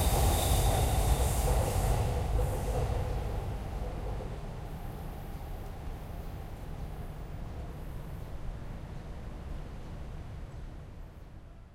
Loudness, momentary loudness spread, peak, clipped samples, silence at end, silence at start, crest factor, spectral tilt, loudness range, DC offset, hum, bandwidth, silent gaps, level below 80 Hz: -35 LUFS; 16 LU; -14 dBFS; under 0.1%; 0 s; 0 s; 18 dB; -5 dB/octave; 13 LU; under 0.1%; none; 16 kHz; none; -36 dBFS